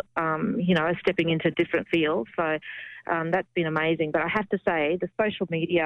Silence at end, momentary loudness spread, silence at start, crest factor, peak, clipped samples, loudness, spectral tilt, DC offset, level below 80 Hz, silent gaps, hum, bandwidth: 0 s; 5 LU; 0.15 s; 14 dB; -12 dBFS; under 0.1%; -26 LUFS; -8 dB/octave; under 0.1%; -60 dBFS; none; none; 6.2 kHz